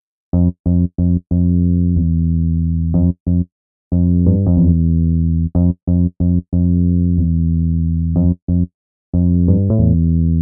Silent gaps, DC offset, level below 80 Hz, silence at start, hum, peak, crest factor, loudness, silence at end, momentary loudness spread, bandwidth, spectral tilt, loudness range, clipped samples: 0.59-0.64 s, 3.20-3.26 s, 3.52-3.91 s, 5.83-5.87 s, 8.42-8.47 s, 8.74-9.13 s; under 0.1%; -28 dBFS; 0.35 s; none; -2 dBFS; 14 dB; -16 LUFS; 0 s; 5 LU; 1.3 kHz; -19 dB/octave; 1 LU; under 0.1%